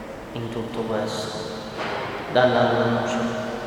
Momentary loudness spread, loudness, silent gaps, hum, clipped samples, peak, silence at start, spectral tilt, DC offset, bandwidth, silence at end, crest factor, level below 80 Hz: 12 LU; -24 LUFS; none; none; under 0.1%; -6 dBFS; 0 s; -5.5 dB/octave; under 0.1%; 18 kHz; 0 s; 20 dB; -52 dBFS